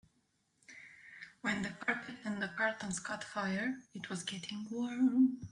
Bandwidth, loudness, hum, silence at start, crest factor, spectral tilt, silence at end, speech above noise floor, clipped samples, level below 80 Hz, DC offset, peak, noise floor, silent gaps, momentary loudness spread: 11 kHz; -37 LUFS; none; 0.7 s; 20 dB; -4.5 dB/octave; 0.05 s; 41 dB; under 0.1%; -74 dBFS; under 0.1%; -18 dBFS; -77 dBFS; none; 21 LU